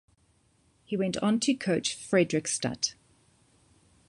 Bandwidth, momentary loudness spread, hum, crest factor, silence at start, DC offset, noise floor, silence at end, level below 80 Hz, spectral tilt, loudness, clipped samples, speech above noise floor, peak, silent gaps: 11.5 kHz; 6 LU; none; 20 dB; 0.9 s; under 0.1%; -67 dBFS; 1.15 s; -66 dBFS; -4 dB/octave; -28 LUFS; under 0.1%; 39 dB; -10 dBFS; none